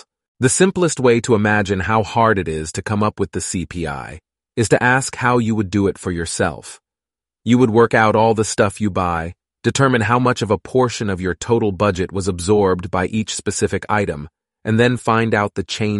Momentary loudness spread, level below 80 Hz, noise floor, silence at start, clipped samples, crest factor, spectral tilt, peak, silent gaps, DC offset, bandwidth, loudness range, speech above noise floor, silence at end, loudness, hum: 10 LU; -44 dBFS; -90 dBFS; 0.4 s; under 0.1%; 16 dB; -5 dB/octave; 0 dBFS; none; under 0.1%; 11.5 kHz; 3 LU; 73 dB; 0 s; -17 LUFS; none